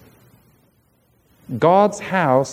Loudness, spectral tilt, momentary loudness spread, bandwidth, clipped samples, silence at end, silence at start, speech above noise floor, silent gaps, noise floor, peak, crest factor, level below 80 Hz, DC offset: -17 LUFS; -6 dB/octave; 7 LU; 15.5 kHz; under 0.1%; 0 s; 1.5 s; 44 dB; none; -60 dBFS; -2 dBFS; 18 dB; -62 dBFS; under 0.1%